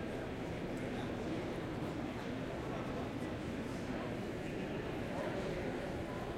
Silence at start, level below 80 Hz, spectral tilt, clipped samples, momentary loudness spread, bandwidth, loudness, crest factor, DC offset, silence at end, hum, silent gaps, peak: 0 s; -54 dBFS; -6.5 dB/octave; under 0.1%; 2 LU; 16 kHz; -41 LUFS; 12 dB; under 0.1%; 0 s; none; none; -28 dBFS